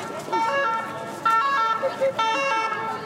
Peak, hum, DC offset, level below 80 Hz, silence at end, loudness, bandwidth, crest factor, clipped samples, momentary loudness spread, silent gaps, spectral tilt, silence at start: -12 dBFS; none; under 0.1%; -72 dBFS; 0 s; -23 LUFS; 16 kHz; 12 dB; under 0.1%; 7 LU; none; -3 dB/octave; 0 s